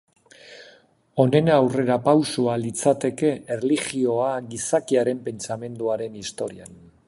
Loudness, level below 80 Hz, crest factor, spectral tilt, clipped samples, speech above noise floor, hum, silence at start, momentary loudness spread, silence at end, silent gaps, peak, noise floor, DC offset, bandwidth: -23 LUFS; -62 dBFS; 18 dB; -5.5 dB/octave; under 0.1%; 33 dB; none; 0.45 s; 12 LU; 0.35 s; none; -4 dBFS; -55 dBFS; under 0.1%; 11.5 kHz